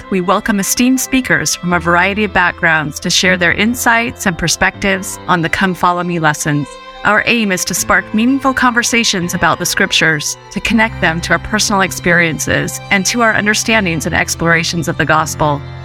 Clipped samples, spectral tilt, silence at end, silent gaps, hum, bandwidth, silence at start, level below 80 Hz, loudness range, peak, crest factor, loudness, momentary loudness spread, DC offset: under 0.1%; -3.5 dB/octave; 0 s; none; none; 18 kHz; 0 s; -36 dBFS; 2 LU; 0 dBFS; 14 dB; -13 LUFS; 5 LU; under 0.1%